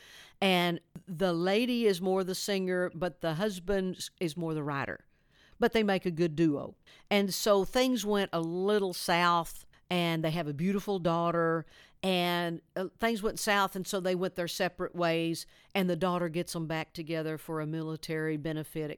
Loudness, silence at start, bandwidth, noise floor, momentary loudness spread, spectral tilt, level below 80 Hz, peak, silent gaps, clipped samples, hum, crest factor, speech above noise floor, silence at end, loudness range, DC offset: -31 LUFS; 0 s; 19 kHz; -63 dBFS; 9 LU; -5 dB/octave; -58 dBFS; -12 dBFS; none; under 0.1%; none; 18 dB; 32 dB; 0 s; 4 LU; under 0.1%